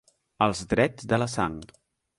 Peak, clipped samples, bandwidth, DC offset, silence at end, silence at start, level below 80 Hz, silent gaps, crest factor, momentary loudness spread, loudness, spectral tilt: -6 dBFS; under 0.1%; 11.5 kHz; under 0.1%; 0.55 s; 0.4 s; -50 dBFS; none; 20 dB; 6 LU; -26 LUFS; -5.5 dB/octave